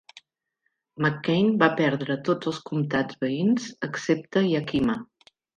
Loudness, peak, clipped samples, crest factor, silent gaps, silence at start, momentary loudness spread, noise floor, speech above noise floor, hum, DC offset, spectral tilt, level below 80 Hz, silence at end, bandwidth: -25 LUFS; -4 dBFS; under 0.1%; 22 dB; none; 0.15 s; 8 LU; -77 dBFS; 53 dB; none; under 0.1%; -6.5 dB/octave; -60 dBFS; 0.55 s; 9 kHz